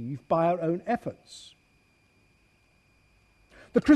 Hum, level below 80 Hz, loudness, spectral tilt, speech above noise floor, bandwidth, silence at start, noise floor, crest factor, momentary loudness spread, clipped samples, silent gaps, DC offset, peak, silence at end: none; -58 dBFS; -28 LUFS; -7.5 dB/octave; 36 dB; 9.6 kHz; 0 s; -65 dBFS; 22 dB; 21 LU; under 0.1%; none; under 0.1%; -8 dBFS; 0 s